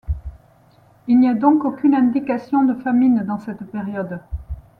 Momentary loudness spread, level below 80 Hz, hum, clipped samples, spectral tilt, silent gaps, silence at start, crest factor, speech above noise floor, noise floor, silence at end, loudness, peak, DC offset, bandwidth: 16 LU; -38 dBFS; none; under 0.1%; -10 dB/octave; none; 0.05 s; 18 dB; 35 dB; -52 dBFS; 0.2 s; -18 LUFS; -2 dBFS; under 0.1%; 4.6 kHz